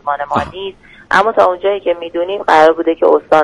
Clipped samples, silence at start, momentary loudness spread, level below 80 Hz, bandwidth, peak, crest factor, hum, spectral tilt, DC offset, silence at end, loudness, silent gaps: 0.1%; 0.05 s; 10 LU; -46 dBFS; 11.5 kHz; 0 dBFS; 12 dB; none; -5 dB/octave; under 0.1%; 0 s; -13 LUFS; none